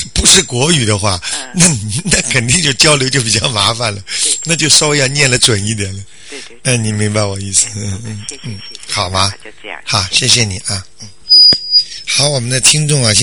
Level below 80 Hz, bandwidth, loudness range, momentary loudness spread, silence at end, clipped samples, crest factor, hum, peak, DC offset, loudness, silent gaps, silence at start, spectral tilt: -34 dBFS; over 20 kHz; 7 LU; 17 LU; 0 s; 0.2%; 14 dB; none; 0 dBFS; 2%; -10 LUFS; none; 0 s; -2.5 dB/octave